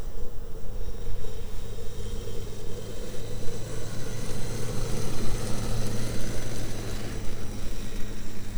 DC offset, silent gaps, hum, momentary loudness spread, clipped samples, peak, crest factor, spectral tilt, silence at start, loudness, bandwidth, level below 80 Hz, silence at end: under 0.1%; none; none; 7 LU; under 0.1%; -10 dBFS; 12 dB; -5 dB/octave; 0 s; -36 LUFS; over 20 kHz; -34 dBFS; 0 s